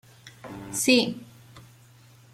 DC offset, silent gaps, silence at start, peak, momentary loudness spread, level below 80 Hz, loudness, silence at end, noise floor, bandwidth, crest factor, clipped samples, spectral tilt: under 0.1%; none; 0.25 s; -6 dBFS; 22 LU; -64 dBFS; -23 LUFS; 0.75 s; -54 dBFS; 15.5 kHz; 22 dB; under 0.1%; -2.5 dB/octave